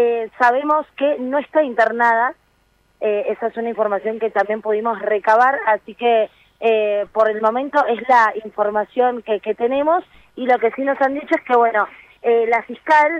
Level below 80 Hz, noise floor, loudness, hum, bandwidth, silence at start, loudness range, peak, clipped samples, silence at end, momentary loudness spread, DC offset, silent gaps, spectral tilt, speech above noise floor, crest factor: -64 dBFS; -60 dBFS; -18 LUFS; none; 8.6 kHz; 0 s; 2 LU; -2 dBFS; under 0.1%; 0 s; 7 LU; under 0.1%; none; -5 dB/octave; 42 dB; 16 dB